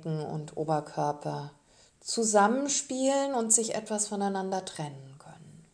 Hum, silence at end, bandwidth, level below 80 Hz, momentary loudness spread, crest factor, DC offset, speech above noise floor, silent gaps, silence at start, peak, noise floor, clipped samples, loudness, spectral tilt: none; 0.15 s; 11 kHz; -72 dBFS; 15 LU; 22 dB; under 0.1%; 22 dB; none; 0 s; -8 dBFS; -51 dBFS; under 0.1%; -28 LUFS; -3.5 dB/octave